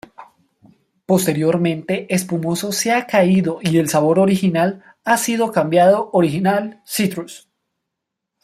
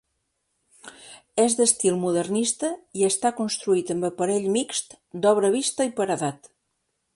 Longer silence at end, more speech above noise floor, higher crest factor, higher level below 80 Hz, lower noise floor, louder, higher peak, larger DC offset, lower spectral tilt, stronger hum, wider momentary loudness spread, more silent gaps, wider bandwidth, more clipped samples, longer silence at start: first, 1.05 s vs 0.8 s; first, 63 dB vs 52 dB; about the same, 16 dB vs 20 dB; first, -60 dBFS vs -68 dBFS; first, -80 dBFS vs -76 dBFS; first, -17 LUFS vs -23 LUFS; first, -2 dBFS vs -6 dBFS; neither; first, -5.5 dB/octave vs -3.5 dB/octave; neither; about the same, 8 LU vs 10 LU; neither; first, 15.5 kHz vs 11.5 kHz; neither; second, 0.2 s vs 0.85 s